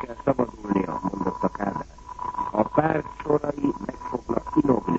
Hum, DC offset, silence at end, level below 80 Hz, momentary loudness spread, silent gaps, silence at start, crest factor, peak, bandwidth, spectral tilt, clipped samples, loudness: none; under 0.1%; 0 s; -48 dBFS; 10 LU; none; 0 s; 20 dB; -6 dBFS; 7.8 kHz; -8.5 dB/octave; under 0.1%; -26 LUFS